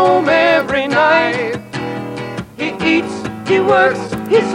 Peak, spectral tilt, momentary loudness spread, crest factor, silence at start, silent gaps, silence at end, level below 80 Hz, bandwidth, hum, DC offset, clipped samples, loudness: -2 dBFS; -5.5 dB/octave; 12 LU; 12 dB; 0 s; none; 0 s; -48 dBFS; 16.5 kHz; none; under 0.1%; under 0.1%; -15 LUFS